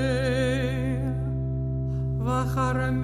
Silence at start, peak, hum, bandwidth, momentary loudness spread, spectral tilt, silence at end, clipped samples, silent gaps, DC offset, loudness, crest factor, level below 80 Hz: 0 s; -14 dBFS; none; 10.5 kHz; 4 LU; -7 dB/octave; 0 s; under 0.1%; none; under 0.1%; -27 LUFS; 12 dB; -36 dBFS